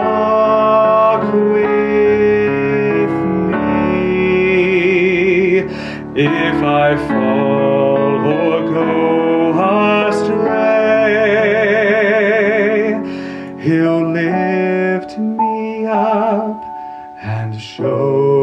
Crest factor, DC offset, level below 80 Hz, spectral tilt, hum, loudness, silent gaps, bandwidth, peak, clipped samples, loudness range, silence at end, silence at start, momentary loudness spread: 12 dB; under 0.1%; -46 dBFS; -7.5 dB/octave; none; -14 LUFS; none; 9.2 kHz; -2 dBFS; under 0.1%; 4 LU; 0 s; 0 s; 9 LU